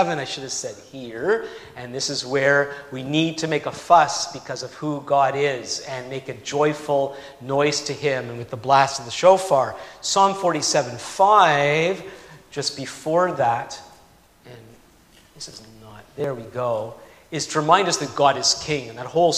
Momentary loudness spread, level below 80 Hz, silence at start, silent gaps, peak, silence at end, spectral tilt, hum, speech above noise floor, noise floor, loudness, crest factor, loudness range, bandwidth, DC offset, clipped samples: 17 LU; -60 dBFS; 0 s; none; -2 dBFS; 0 s; -3.5 dB/octave; none; 31 dB; -53 dBFS; -21 LUFS; 20 dB; 8 LU; 15 kHz; under 0.1%; under 0.1%